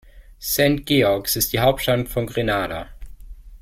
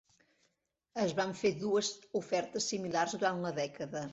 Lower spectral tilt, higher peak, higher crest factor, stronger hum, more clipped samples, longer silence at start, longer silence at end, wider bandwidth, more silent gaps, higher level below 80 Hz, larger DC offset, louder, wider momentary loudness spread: about the same, -4 dB/octave vs -3.5 dB/octave; first, -4 dBFS vs -18 dBFS; about the same, 18 dB vs 18 dB; neither; neither; second, 0.15 s vs 0.95 s; about the same, 0.05 s vs 0 s; first, 16.5 kHz vs 8 kHz; neither; first, -40 dBFS vs -74 dBFS; neither; first, -20 LUFS vs -34 LUFS; first, 12 LU vs 6 LU